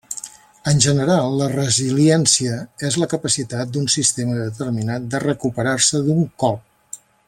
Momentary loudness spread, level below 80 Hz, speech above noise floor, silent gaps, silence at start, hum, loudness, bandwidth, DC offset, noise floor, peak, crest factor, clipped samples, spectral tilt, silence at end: 13 LU; -52 dBFS; 22 dB; none; 0.1 s; none; -18 LUFS; 15 kHz; under 0.1%; -40 dBFS; 0 dBFS; 18 dB; under 0.1%; -4 dB/octave; 0.3 s